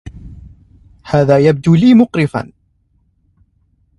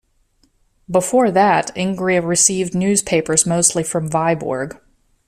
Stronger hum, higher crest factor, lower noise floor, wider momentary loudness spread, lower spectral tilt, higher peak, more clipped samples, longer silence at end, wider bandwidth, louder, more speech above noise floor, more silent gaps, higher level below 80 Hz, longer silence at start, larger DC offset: neither; about the same, 14 dB vs 18 dB; about the same, -58 dBFS vs -60 dBFS; first, 18 LU vs 8 LU; first, -8.5 dB/octave vs -4 dB/octave; about the same, 0 dBFS vs 0 dBFS; neither; first, 1.55 s vs 0.55 s; second, 11 kHz vs 14.5 kHz; first, -12 LUFS vs -16 LUFS; first, 48 dB vs 43 dB; neither; first, -42 dBFS vs -52 dBFS; second, 0.05 s vs 0.9 s; neither